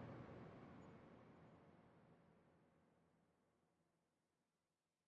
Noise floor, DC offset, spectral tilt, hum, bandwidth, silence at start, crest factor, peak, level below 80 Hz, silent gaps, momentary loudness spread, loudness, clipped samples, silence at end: under -90 dBFS; under 0.1%; -7 dB/octave; none; 6.2 kHz; 0 s; 20 dB; -46 dBFS; -86 dBFS; none; 10 LU; -63 LUFS; under 0.1%; 1.05 s